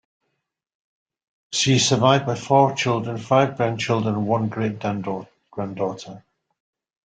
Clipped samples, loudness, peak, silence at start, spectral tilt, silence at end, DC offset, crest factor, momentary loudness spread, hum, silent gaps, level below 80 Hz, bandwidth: under 0.1%; -21 LUFS; -2 dBFS; 1.5 s; -4.5 dB/octave; 0.9 s; under 0.1%; 22 dB; 14 LU; none; none; -60 dBFS; 9.4 kHz